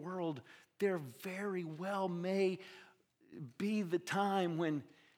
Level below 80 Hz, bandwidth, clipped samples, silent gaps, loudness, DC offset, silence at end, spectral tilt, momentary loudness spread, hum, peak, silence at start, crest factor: under -90 dBFS; 19 kHz; under 0.1%; none; -38 LUFS; under 0.1%; 0.3 s; -6.5 dB/octave; 16 LU; none; -20 dBFS; 0 s; 18 dB